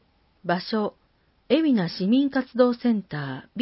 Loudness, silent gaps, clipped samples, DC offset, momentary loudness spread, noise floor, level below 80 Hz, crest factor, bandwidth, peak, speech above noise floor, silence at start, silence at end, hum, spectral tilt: -24 LUFS; none; under 0.1%; under 0.1%; 11 LU; -64 dBFS; -66 dBFS; 18 dB; 5.8 kHz; -6 dBFS; 41 dB; 0.45 s; 0 s; none; -10.5 dB/octave